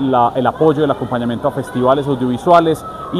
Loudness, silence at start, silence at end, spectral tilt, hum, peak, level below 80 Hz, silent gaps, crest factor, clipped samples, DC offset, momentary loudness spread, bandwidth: -15 LUFS; 0 s; 0 s; -7.5 dB/octave; none; 0 dBFS; -46 dBFS; none; 14 dB; under 0.1%; under 0.1%; 8 LU; 14 kHz